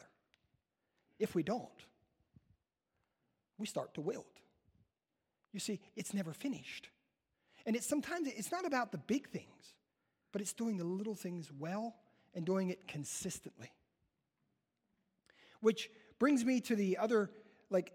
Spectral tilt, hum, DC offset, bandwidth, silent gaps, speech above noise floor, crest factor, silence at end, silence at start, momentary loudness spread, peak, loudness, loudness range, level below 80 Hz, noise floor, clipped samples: -5 dB/octave; none; under 0.1%; 16 kHz; none; 50 dB; 22 dB; 0 s; 1.2 s; 14 LU; -18 dBFS; -39 LUFS; 9 LU; -80 dBFS; -89 dBFS; under 0.1%